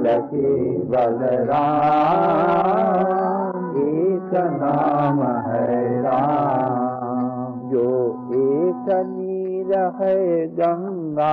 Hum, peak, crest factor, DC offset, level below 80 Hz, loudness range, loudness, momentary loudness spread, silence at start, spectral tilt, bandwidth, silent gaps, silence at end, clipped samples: none; -8 dBFS; 12 dB; under 0.1%; -60 dBFS; 3 LU; -20 LUFS; 7 LU; 0 s; -10 dB/octave; 5.2 kHz; none; 0 s; under 0.1%